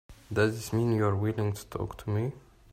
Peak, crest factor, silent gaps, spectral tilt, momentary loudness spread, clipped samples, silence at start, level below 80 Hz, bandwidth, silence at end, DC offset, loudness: -12 dBFS; 18 dB; none; -7 dB/octave; 9 LU; under 0.1%; 0.1 s; -54 dBFS; 15.5 kHz; 0.35 s; under 0.1%; -30 LUFS